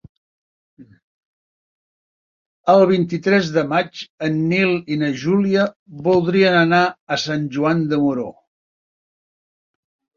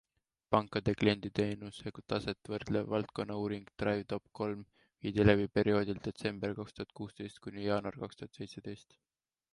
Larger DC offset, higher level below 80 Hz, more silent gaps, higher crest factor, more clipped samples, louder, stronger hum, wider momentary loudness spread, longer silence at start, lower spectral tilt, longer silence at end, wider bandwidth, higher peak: neither; about the same, -60 dBFS vs -56 dBFS; first, 1.02-2.64 s, 4.10-4.18 s, 5.76-5.86 s, 7.00-7.07 s vs none; second, 18 dB vs 26 dB; neither; first, -18 LUFS vs -35 LUFS; neither; second, 10 LU vs 15 LU; first, 0.8 s vs 0.5 s; about the same, -6.5 dB/octave vs -7 dB/octave; first, 1.85 s vs 0.8 s; second, 7.4 kHz vs 11.5 kHz; first, -2 dBFS vs -10 dBFS